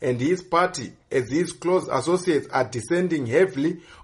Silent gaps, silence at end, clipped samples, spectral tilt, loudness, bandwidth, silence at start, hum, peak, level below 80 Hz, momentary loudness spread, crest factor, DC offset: none; 0.1 s; under 0.1%; -5.5 dB/octave; -23 LUFS; 11.5 kHz; 0 s; none; -6 dBFS; -60 dBFS; 6 LU; 18 dB; under 0.1%